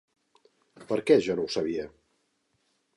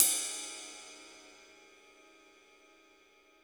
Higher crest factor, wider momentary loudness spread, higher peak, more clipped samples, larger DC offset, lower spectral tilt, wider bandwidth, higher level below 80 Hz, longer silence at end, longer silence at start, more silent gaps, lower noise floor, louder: second, 22 dB vs 36 dB; second, 12 LU vs 26 LU; second, -8 dBFS vs -2 dBFS; neither; neither; first, -5.5 dB/octave vs 2 dB/octave; second, 11.5 kHz vs over 20 kHz; first, -66 dBFS vs -84 dBFS; second, 1.1 s vs 2.1 s; first, 0.8 s vs 0 s; neither; first, -74 dBFS vs -64 dBFS; first, -27 LUFS vs -34 LUFS